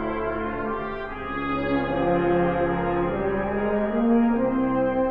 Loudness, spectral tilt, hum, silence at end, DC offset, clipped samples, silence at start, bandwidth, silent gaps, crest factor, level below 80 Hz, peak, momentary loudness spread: -24 LUFS; -10 dB/octave; none; 0 s; under 0.1%; under 0.1%; 0 s; 4.8 kHz; none; 12 dB; -40 dBFS; -10 dBFS; 8 LU